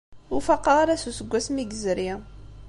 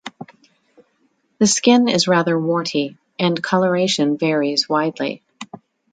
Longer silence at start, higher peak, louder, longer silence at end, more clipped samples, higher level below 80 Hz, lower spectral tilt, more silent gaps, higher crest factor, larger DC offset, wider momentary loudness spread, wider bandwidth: about the same, 0.1 s vs 0.05 s; second, -6 dBFS vs 0 dBFS; second, -24 LUFS vs -18 LUFS; second, 0 s vs 0.35 s; neither; first, -46 dBFS vs -64 dBFS; about the same, -4 dB/octave vs -4 dB/octave; neither; about the same, 18 dB vs 18 dB; neither; second, 12 LU vs 17 LU; first, 11.5 kHz vs 9.4 kHz